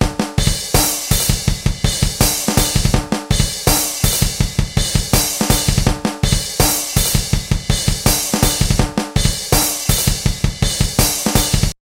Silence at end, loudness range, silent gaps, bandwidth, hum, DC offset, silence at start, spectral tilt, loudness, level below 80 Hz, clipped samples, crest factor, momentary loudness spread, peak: 0.2 s; 0 LU; none; 17 kHz; none; under 0.1%; 0 s; -3.5 dB/octave; -16 LUFS; -22 dBFS; under 0.1%; 16 dB; 4 LU; 0 dBFS